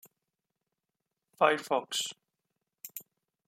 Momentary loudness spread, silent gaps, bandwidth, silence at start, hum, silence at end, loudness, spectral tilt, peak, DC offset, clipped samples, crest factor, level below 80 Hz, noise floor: 19 LU; none; 16.5 kHz; 1.4 s; none; 0.45 s; -30 LUFS; -2 dB/octave; -8 dBFS; under 0.1%; under 0.1%; 26 dB; under -90 dBFS; -87 dBFS